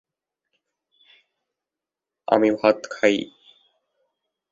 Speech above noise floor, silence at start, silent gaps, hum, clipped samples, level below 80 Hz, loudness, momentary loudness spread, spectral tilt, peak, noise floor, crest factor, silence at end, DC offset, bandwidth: 68 dB; 2.3 s; none; none; under 0.1%; -70 dBFS; -21 LUFS; 16 LU; -5 dB/octave; -2 dBFS; -88 dBFS; 24 dB; 1.25 s; under 0.1%; 7.8 kHz